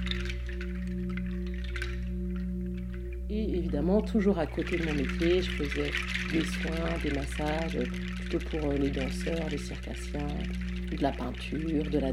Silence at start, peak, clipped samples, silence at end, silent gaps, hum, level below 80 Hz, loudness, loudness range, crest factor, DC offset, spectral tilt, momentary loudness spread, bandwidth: 0 s; -14 dBFS; under 0.1%; 0 s; none; 60 Hz at -35 dBFS; -36 dBFS; -32 LUFS; 5 LU; 18 dB; under 0.1%; -6.5 dB/octave; 8 LU; 12.5 kHz